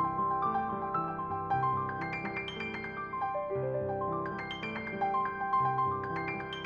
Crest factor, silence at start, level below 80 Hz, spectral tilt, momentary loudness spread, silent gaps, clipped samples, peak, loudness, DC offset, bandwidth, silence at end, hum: 14 dB; 0 s; -60 dBFS; -7.5 dB/octave; 7 LU; none; under 0.1%; -20 dBFS; -33 LUFS; under 0.1%; 7 kHz; 0 s; none